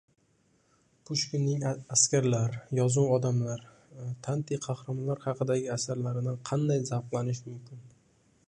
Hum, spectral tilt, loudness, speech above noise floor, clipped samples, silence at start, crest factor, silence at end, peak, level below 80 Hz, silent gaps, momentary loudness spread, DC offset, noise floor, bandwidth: none; -5 dB/octave; -30 LUFS; 39 dB; under 0.1%; 1.1 s; 22 dB; 0.6 s; -8 dBFS; -68 dBFS; none; 14 LU; under 0.1%; -69 dBFS; 11 kHz